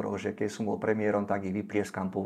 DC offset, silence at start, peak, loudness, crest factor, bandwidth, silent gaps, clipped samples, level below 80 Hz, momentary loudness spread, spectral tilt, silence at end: under 0.1%; 0 s; -14 dBFS; -31 LUFS; 18 dB; 13.5 kHz; none; under 0.1%; -72 dBFS; 5 LU; -6.5 dB/octave; 0 s